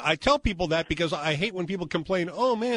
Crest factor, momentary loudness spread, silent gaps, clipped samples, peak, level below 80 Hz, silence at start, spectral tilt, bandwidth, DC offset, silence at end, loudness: 18 dB; 6 LU; none; under 0.1%; -8 dBFS; -42 dBFS; 0 s; -5 dB/octave; 10.5 kHz; under 0.1%; 0 s; -26 LUFS